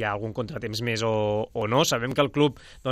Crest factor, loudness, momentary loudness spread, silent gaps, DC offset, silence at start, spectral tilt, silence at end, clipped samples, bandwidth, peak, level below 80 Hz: 18 dB; -26 LUFS; 9 LU; none; under 0.1%; 0 s; -4.5 dB/octave; 0 s; under 0.1%; 15.5 kHz; -8 dBFS; -52 dBFS